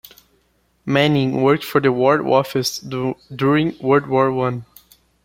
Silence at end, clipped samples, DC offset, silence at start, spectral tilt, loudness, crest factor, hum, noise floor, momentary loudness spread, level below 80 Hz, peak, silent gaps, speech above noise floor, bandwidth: 0.6 s; under 0.1%; under 0.1%; 0.85 s; -6 dB/octave; -18 LUFS; 18 dB; none; -62 dBFS; 9 LU; -56 dBFS; -2 dBFS; none; 45 dB; 16.5 kHz